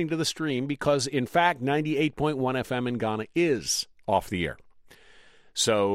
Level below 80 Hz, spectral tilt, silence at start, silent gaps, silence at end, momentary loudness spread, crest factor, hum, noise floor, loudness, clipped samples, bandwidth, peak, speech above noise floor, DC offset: -56 dBFS; -4 dB/octave; 0 s; none; 0 s; 6 LU; 18 dB; none; -54 dBFS; -27 LUFS; under 0.1%; 16 kHz; -8 dBFS; 28 dB; under 0.1%